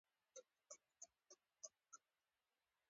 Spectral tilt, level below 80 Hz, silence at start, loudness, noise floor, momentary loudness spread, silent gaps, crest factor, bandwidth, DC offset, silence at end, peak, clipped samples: 0.5 dB/octave; under -90 dBFS; 0.35 s; -63 LUFS; under -90 dBFS; 7 LU; none; 28 dB; 7.4 kHz; under 0.1%; 0.9 s; -40 dBFS; under 0.1%